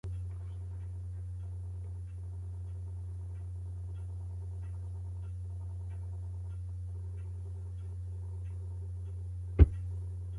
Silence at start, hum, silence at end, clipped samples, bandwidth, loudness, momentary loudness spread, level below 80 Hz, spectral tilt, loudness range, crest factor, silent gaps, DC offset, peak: 0.05 s; none; 0 s; under 0.1%; 10.5 kHz; -39 LUFS; 3 LU; -40 dBFS; -9.5 dB/octave; 7 LU; 28 dB; none; under 0.1%; -8 dBFS